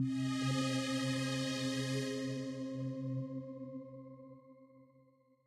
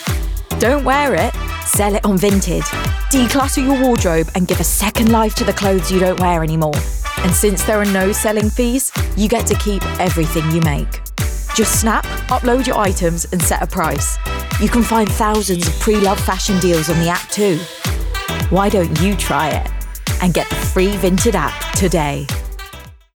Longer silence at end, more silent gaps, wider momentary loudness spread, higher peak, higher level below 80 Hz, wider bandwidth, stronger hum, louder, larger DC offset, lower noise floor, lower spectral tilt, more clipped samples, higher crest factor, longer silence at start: first, 0.6 s vs 0.2 s; neither; first, 17 LU vs 7 LU; second, -24 dBFS vs -4 dBFS; second, -76 dBFS vs -24 dBFS; second, 14 kHz vs over 20 kHz; neither; second, -38 LUFS vs -16 LUFS; neither; first, -68 dBFS vs -36 dBFS; about the same, -5 dB/octave vs -4.5 dB/octave; neither; about the same, 14 dB vs 12 dB; about the same, 0 s vs 0 s